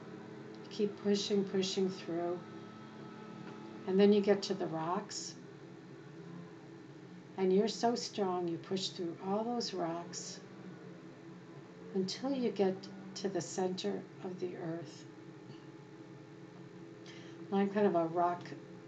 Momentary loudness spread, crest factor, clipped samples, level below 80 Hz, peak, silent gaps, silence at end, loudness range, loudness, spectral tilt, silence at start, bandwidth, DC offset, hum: 21 LU; 20 dB; under 0.1%; -82 dBFS; -16 dBFS; none; 0 s; 7 LU; -35 LUFS; -5.5 dB/octave; 0 s; 8.6 kHz; under 0.1%; none